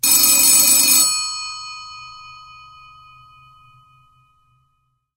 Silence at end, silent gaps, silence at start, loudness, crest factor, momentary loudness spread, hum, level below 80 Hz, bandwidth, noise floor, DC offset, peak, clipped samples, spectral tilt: 2.85 s; none; 0.05 s; -11 LUFS; 20 dB; 25 LU; none; -60 dBFS; 17.5 kHz; -68 dBFS; under 0.1%; 0 dBFS; under 0.1%; 2 dB/octave